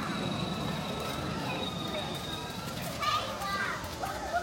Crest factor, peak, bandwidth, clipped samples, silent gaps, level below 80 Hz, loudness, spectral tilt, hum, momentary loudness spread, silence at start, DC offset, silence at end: 16 dB; -18 dBFS; 17 kHz; under 0.1%; none; -52 dBFS; -34 LUFS; -4 dB/octave; none; 6 LU; 0 s; under 0.1%; 0 s